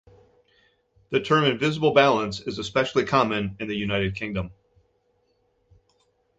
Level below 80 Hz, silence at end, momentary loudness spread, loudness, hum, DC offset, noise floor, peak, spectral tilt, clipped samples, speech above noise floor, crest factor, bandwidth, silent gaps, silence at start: -52 dBFS; 1.85 s; 11 LU; -23 LUFS; none; under 0.1%; -68 dBFS; -4 dBFS; -5.5 dB/octave; under 0.1%; 45 dB; 22 dB; 8.2 kHz; none; 1.1 s